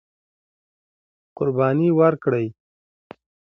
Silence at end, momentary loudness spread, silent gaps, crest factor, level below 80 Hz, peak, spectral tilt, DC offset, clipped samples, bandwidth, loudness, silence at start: 1 s; 9 LU; none; 20 dB; -66 dBFS; -4 dBFS; -11 dB/octave; under 0.1%; under 0.1%; 5.8 kHz; -20 LUFS; 1.4 s